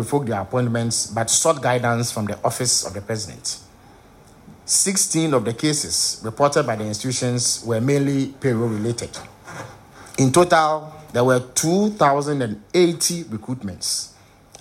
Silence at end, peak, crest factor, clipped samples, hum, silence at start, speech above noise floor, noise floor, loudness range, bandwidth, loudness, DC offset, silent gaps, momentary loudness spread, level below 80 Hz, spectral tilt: 0.5 s; -4 dBFS; 18 dB; under 0.1%; none; 0 s; 27 dB; -48 dBFS; 3 LU; 16 kHz; -20 LUFS; under 0.1%; none; 12 LU; -56 dBFS; -4 dB/octave